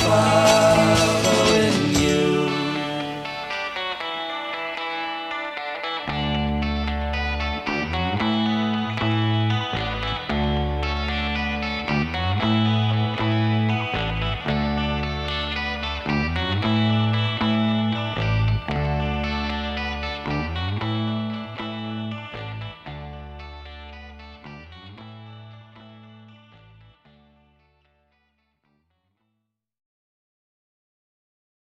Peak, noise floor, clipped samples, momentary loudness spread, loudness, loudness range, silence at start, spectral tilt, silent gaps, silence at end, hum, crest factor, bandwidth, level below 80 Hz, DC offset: -4 dBFS; -78 dBFS; under 0.1%; 19 LU; -23 LUFS; 15 LU; 0 s; -5 dB/octave; none; 5.25 s; none; 20 dB; 14 kHz; -36 dBFS; under 0.1%